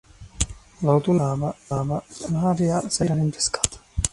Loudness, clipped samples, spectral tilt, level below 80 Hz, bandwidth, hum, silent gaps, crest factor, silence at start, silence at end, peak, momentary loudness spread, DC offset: -24 LUFS; under 0.1%; -5 dB/octave; -40 dBFS; 11.5 kHz; none; none; 22 dB; 0.2 s; 0.05 s; 0 dBFS; 8 LU; under 0.1%